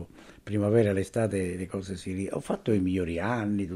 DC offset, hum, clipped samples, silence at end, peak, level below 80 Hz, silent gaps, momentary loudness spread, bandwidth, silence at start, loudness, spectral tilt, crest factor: under 0.1%; none; under 0.1%; 0 s; -12 dBFS; -54 dBFS; none; 11 LU; 12.5 kHz; 0 s; -29 LUFS; -7 dB/octave; 18 dB